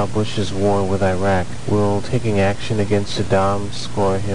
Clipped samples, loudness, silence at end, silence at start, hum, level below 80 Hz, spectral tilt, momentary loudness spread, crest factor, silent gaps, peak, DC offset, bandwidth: under 0.1%; -19 LUFS; 0 s; 0 s; none; -40 dBFS; -6 dB/octave; 4 LU; 14 dB; none; -4 dBFS; 6%; 10 kHz